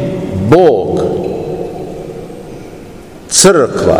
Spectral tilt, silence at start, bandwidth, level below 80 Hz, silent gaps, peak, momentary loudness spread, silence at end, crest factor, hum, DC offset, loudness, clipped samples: -4 dB/octave; 0 s; over 20 kHz; -38 dBFS; none; 0 dBFS; 23 LU; 0 s; 12 dB; none; 0.6%; -11 LUFS; 1%